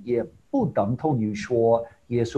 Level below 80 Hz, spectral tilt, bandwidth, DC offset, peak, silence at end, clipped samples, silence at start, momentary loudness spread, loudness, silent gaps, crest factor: -54 dBFS; -8 dB/octave; 8.8 kHz; under 0.1%; -8 dBFS; 0 s; under 0.1%; 0 s; 7 LU; -25 LUFS; none; 16 dB